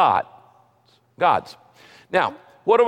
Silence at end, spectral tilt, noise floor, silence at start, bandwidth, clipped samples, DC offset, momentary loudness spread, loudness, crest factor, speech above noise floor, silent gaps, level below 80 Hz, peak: 0 s; -5.5 dB/octave; -60 dBFS; 0 s; 10 kHz; under 0.1%; under 0.1%; 13 LU; -22 LUFS; 16 dB; 40 dB; none; -64 dBFS; -6 dBFS